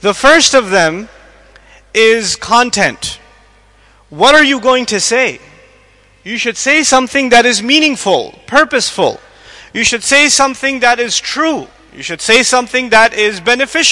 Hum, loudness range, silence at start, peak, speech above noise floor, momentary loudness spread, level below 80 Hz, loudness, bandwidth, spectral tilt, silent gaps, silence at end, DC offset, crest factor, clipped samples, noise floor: none; 2 LU; 0.05 s; 0 dBFS; 35 dB; 10 LU; -44 dBFS; -10 LUFS; 12 kHz; -1.5 dB/octave; none; 0 s; under 0.1%; 12 dB; 0.2%; -46 dBFS